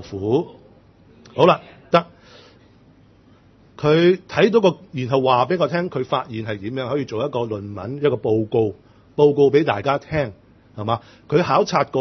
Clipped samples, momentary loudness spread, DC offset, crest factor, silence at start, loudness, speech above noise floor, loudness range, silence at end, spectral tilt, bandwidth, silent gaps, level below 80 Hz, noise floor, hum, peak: under 0.1%; 12 LU; under 0.1%; 20 dB; 0 s; -20 LUFS; 33 dB; 4 LU; 0 s; -7 dB/octave; 6.4 kHz; none; -56 dBFS; -51 dBFS; none; 0 dBFS